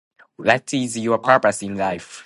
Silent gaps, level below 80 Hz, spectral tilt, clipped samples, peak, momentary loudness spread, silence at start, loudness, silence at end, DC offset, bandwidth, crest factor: none; -58 dBFS; -4.5 dB/octave; under 0.1%; 0 dBFS; 8 LU; 0.4 s; -20 LUFS; 0.05 s; under 0.1%; 11.5 kHz; 20 dB